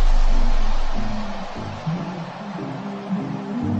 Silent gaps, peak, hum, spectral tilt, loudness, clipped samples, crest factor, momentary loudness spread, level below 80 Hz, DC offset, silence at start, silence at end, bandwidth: none; -8 dBFS; none; -6.5 dB/octave; -28 LUFS; under 0.1%; 12 dB; 7 LU; -20 dBFS; under 0.1%; 0 s; 0 s; 7 kHz